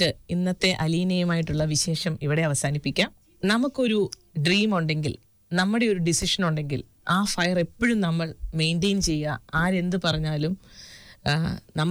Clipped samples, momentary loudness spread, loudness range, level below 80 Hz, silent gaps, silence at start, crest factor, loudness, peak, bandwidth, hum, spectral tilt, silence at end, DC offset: under 0.1%; 7 LU; 2 LU; -44 dBFS; none; 0 s; 12 dB; -25 LUFS; -12 dBFS; over 20 kHz; none; -4.5 dB/octave; 0 s; under 0.1%